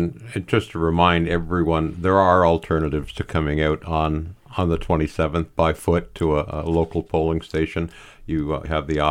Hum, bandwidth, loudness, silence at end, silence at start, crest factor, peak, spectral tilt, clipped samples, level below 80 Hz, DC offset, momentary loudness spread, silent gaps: none; 14.5 kHz; -22 LUFS; 0 s; 0 s; 18 dB; -2 dBFS; -7.5 dB/octave; under 0.1%; -34 dBFS; under 0.1%; 9 LU; none